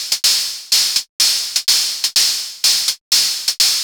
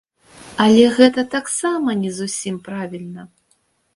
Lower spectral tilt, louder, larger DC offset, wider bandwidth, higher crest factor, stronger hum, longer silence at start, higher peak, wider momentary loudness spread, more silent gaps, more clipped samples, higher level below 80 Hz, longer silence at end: second, 4 dB/octave vs -4.5 dB/octave; first, -14 LUFS vs -17 LUFS; neither; first, over 20 kHz vs 11.5 kHz; about the same, 16 dB vs 18 dB; neither; second, 0 s vs 0.4 s; about the same, -2 dBFS vs 0 dBFS; second, 3 LU vs 20 LU; first, 1.09-1.19 s, 3.01-3.11 s vs none; neither; about the same, -60 dBFS vs -58 dBFS; second, 0 s vs 0.7 s